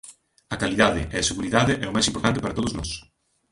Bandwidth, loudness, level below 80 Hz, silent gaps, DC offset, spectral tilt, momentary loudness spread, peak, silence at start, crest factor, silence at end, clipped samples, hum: 11.5 kHz; -23 LUFS; -42 dBFS; none; under 0.1%; -4 dB/octave; 11 LU; -2 dBFS; 0.05 s; 22 dB; 0.5 s; under 0.1%; none